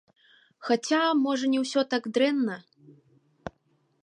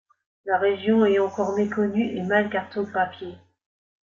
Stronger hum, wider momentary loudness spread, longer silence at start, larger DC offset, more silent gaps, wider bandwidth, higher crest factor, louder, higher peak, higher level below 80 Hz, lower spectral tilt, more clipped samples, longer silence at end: neither; first, 20 LU vs 9 LU; first, 0.6 s vs 0.45 s; neither; neither; first, 10.5 kHz vs 7.2 kHz; about the same, 18 dB vs 18 dB; second, -26 LUFS vs -23 LUFS; second, -12 dBFS vs -6 dBFS; about the same, -68 dBFS vs -68 dBFS; second, -3.5 dB/octave vs -7 dB/octave; neither; second, 0.55 s vs 0.7 s